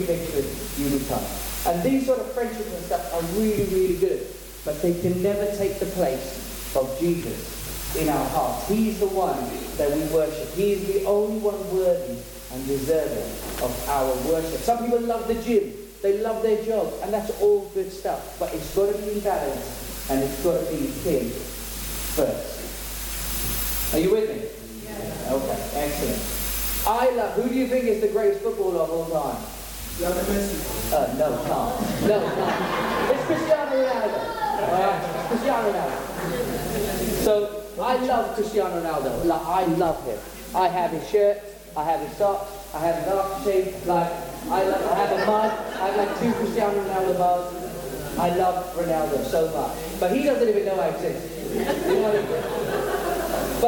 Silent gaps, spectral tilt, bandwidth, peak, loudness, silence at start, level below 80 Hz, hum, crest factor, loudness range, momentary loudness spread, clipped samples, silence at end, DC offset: none; -5 dB/octave; 17.5 kHz; -8 dBFS; -24 LUFS; 0 s; -40 dBFS; none; 16 dB; 2 LU; 9 LU; under 0.1%; 0 s; under 0.1%